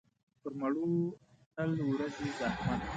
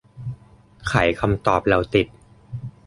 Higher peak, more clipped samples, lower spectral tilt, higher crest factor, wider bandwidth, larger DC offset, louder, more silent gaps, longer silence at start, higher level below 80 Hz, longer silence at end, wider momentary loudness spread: second, -22 dBFS vs -2 dBFS; neither; about the same, -7 dB/octave vs -6.5 dB/octave; second, 14 dB vs 20 dB; second, 9 kHz vs 11.5 kHz; neither; second, -35 LUFS vs -21 LUFS; first, 1.46-1.51 s vs none; first, 0.45 s vs 0.15 s; second, -56 dBFS vs -40 dBFS; second, 0 s vs 0.15 s; second, 14 LU vs 17 LU